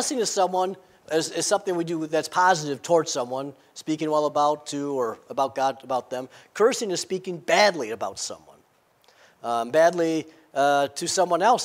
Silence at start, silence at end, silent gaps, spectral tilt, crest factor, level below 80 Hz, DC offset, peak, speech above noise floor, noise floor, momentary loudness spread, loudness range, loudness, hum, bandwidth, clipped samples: 0 s; 0 s; none; -3 dB/octave; 20 dB; -76 dBFS; under 0.1%; -6 dBFS; 38 dB; -62 dBFS; 13 LU; 2 LU; -24 LUFS; none; 16 kHz; under 0.1%